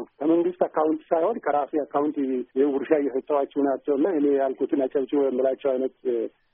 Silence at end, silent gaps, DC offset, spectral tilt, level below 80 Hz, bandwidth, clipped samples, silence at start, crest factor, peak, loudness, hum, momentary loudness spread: 0.25 s; none; under 0.1%; -2 dB/octave; -72 dBFS; 3.7 kHz; under 0.1%; 0 s; 16 dB; -6 dBFS; -24 LUFS; none; 5 LU